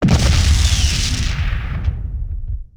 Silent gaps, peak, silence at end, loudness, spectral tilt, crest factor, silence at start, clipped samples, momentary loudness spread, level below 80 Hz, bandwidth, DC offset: none; -2 dBFS; 0.15 s; -18 LUFS; -4 dB/octave; 14 dB; 0 s; under 0.1%; 13 LU; -18 dBFS; 15 kHz; 0.3%